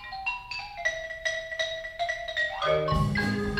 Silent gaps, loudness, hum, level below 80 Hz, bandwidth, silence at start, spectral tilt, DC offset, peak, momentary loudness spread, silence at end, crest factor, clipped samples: none; -29 LUFS; none; -44 dBFS; 15.5 kHz; 0 s; -5 dB/octave; under 0.1%; -14 dBFS; 6 LU; 0 s; 16 dB; under 0.1%